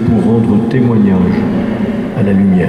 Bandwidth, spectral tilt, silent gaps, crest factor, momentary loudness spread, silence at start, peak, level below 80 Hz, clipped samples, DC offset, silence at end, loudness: 8.8 kHz; -9.5 dB/octave; none; 10 dB; 5 LU; 0 s; 0 dBFS; -38 dBFS; under 0.1%; under 0.1%; 0 s; -12 LUFS